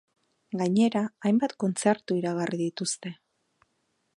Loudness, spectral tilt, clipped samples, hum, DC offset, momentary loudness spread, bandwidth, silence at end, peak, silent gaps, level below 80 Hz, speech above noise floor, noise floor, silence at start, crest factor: -27 LUFS; -5.5 dB/octave; under 0.1%; none; under 0.1%; 8 LU; 11.5 kHz; 1.05 s; -8 dBFS; none; -76 dBFS; 48 dB; -75 dBFS; 0.5 s; 20 dB